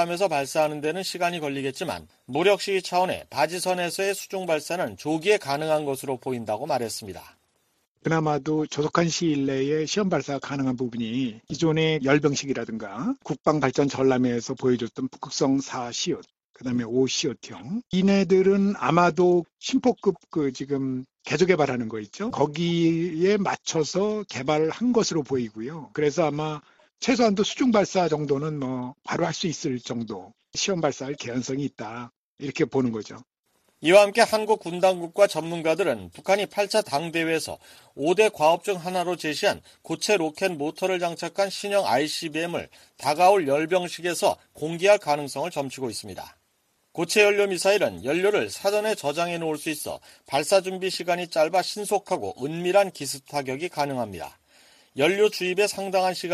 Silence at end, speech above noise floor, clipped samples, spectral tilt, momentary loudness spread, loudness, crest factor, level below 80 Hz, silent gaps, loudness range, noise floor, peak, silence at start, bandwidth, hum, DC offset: 0 s; 46 dB; under 0.1%; -4.5 dB/octave; 11 LU; -24 LUFS; 22 dB; -62 dBFS; 7.87-7.95 s, 16.44-16.54 s, 19.53-19.57 s, 32.16-32.38 s, 33.39-33.43 s; 5 LU; -70 dBFS; -4 dBFS; 0 s; 14.5 kHz; none; under 0.1%